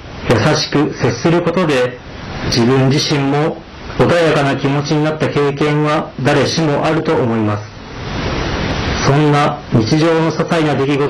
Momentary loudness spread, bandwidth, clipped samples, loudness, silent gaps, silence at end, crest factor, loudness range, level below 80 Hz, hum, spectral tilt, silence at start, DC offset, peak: 8 LU; 11.5 kHz; under 0.1%; -14 LUFS; none; 0 s; 10 dB; 2 LU; -34 dBFS; none; -6 dB/octave; 0 s; under 0.1%; -4 dBFS